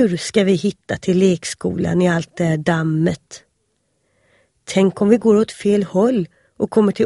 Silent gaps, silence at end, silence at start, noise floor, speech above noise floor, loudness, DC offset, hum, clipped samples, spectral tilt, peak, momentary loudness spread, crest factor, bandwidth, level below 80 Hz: none; 0 s; 0 s; -68 dBFS; 51 dB; -18 LUFS; under 0.1%; none; under 0.1%; -6.5 dB/octave; 0 dBFS; 8 LU; 16 dB; 11.5 kHz; -52 dBFS